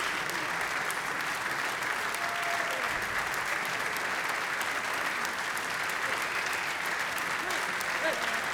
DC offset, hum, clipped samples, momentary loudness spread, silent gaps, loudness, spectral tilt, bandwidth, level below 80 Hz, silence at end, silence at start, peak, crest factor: under 0.1%; none; under 0.1%; 2 LU; none; -30 LUFS; -1 dB/octave; over 20 kHz; -64 dBFS; 0 s; 0 s; -12 dBFS; 20 dB